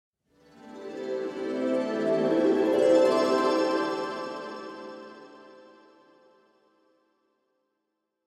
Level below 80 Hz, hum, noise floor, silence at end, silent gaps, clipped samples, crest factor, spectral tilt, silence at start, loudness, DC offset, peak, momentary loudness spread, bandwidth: -74 dBFS; none; -81 dBFS; 2.7 s; none; under 0.1%; 18 dB; -5 dB/octave; 0.65 s; -26 LUFS; under 0.1%; -10 dBFS; 22 LU; 13 kHz